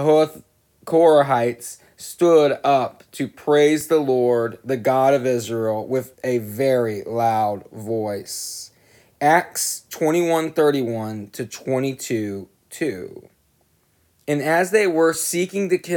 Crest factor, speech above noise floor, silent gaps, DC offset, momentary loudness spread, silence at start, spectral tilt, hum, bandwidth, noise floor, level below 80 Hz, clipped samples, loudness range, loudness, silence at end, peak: 16 dB; 43 dB; none; under 0.1%; 14 LU; 0 s; -4.5 dB/octave; none; 19.5 kHz; -63 dBFS; -68 dBFS; under 0.1%; 6 LU; -20 LUFS; 0 s; -4 dBFS